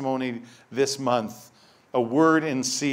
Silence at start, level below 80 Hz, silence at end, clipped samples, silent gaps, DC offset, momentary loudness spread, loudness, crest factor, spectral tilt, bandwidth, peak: 0 s; -72 dBFS; 0 s; under 0.1%; none; under 0.1%; 15 LU; -24 LUFS; 18 dB; -4 dB/octave; 16 kHz; -6 dBFS